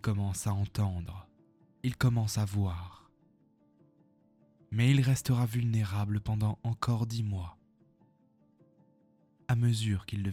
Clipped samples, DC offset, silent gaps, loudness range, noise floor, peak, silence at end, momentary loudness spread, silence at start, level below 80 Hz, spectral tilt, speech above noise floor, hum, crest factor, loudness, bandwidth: under 0.1%; under 0.1%; none; 5 LU; -67 dBFS; -14 dBFS; 0 s; 13 LU; 0.05 s; -54 dBFS; -6 dB/octave; 37 dB; none; 18 dB; -31 LUFS; 15.5 kHz